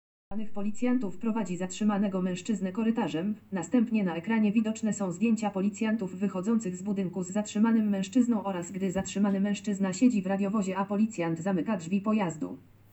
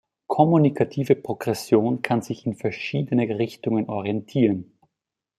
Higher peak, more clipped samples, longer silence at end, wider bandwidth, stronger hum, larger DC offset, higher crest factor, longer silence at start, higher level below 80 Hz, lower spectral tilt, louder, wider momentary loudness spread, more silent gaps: second, -12 dBFS vs -2 dBFS; neither; second, 0 s vs 0.75 s; second, 8.2 kHz vs 14.5 kHz; neither; neither; about the same, 16 dB vs 20 dB; about the same, 0.3 s vs 0.3 s; about the same, -66 dBFS vs -64 dBFS; about the same, -6.5 dB/octave vs -7.5 dB/octave; second, -29 LUFS vs -23 LUFS; about the same, 7 LU vs 9 LU; neither